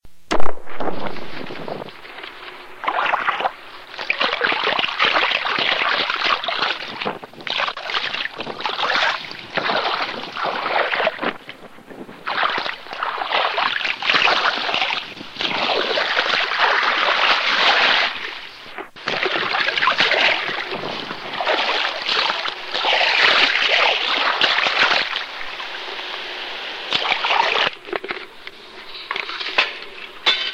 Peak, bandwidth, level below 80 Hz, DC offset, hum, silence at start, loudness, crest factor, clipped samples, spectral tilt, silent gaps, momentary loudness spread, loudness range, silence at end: 0 dBFS; 15 kHz; -50 dBFS; under 0.1%; none; 0.05 s; -19 LUFS; 20 dB; under 0.1%; -2 dB/octave; none; 17 LU; 6 LU; 0 s